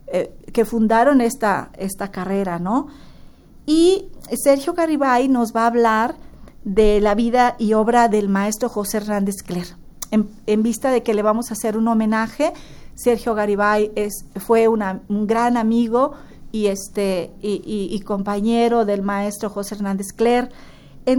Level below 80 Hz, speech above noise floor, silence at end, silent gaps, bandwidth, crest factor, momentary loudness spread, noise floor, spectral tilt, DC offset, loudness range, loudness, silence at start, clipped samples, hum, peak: -40 dBFS; 24 dB; 0 s; none; over 20 kHz; 16 dB; 10 LU; -43 dBFS; -5.5 dB/octave; under 0.1%; 4 LU; -19 LUFS; 0.05 s; under 0.1%; none; -2 dBFS